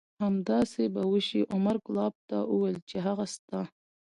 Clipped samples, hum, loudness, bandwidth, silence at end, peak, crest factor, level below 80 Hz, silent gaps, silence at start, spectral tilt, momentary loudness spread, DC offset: under 0.1%; none; -30 LUFS; 11 kHz; 0.45 s; -14 dBFS; 16 dB; -68 dBFS; 2.15-2.28 s, 2.82-2.87 s, 3.39-3.48 s; 0.2 s; -6.5 dB/octave; 8 LU; under 0.1%